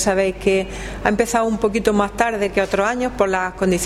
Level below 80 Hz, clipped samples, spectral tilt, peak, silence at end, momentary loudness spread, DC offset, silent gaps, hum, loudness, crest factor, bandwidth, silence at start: -36 dBFS; under 0.1%; -4.5 dB/octave; 0 dBFS; 0 s; 3 LU; under 0.1%; none; none; -19 LUFS; 18 dB; 15.5 kHz; 0 s